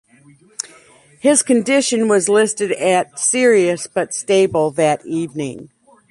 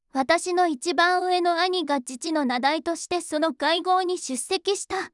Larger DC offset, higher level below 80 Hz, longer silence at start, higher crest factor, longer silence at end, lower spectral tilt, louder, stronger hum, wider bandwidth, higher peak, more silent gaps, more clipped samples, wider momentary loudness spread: neither; first, -60 dBFS vs -68 dBFS; first, 0.65 s vs 0.15 s; about the same, 16 dB vs 18 dB; first, 0.45 s vs 0.05 s; first, -3.5 dB/octave vs -1.5 dB/octave; first, -16 LUFS vs -24 LUFS; neither; about the same, 11.5 kHz vs 12 kHz; first, -2 dBFS vs -6 dBFS; neither; neither; first, 16 LU vs 7 LU